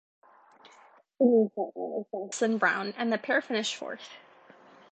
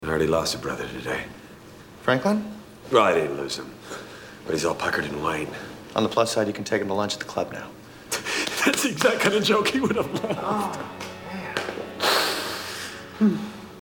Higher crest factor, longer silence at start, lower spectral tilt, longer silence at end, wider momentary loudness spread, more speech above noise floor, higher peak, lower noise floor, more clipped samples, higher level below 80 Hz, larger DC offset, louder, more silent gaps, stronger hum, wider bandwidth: about the same, 20 dB vs 22 dB; first, 1.2 s vs 0 s; about the same, -4 dB/octave vs -3.5 dB/octave; first, 0.75 s vs 0 s; second, 14 LU vs 17 LU; first, 30 dB vs 21 dB; second, -10 dBFS vs -4 dBFS; first, -58 dBFS vs -45 dBFS; neither; second, -84 dBFS vs -54 dBFS; neither; second, -28 LUFS vs -25 LUFS; neither; neither; second, 9 kHz vs 19 kHz